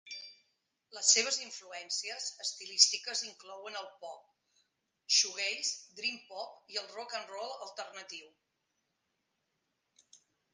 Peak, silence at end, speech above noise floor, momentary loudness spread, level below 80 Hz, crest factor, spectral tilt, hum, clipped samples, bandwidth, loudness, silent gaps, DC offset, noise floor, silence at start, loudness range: -8 dBFS; 0.4 s; 47 dB; 21 LU; under -90 dBFS; 30 dB; 3 dB/octave; none; under 0.1%; 10 kHz; -31 LUFS; none; under 0.1%; -83 dBFS; 0.05 s; 14 LU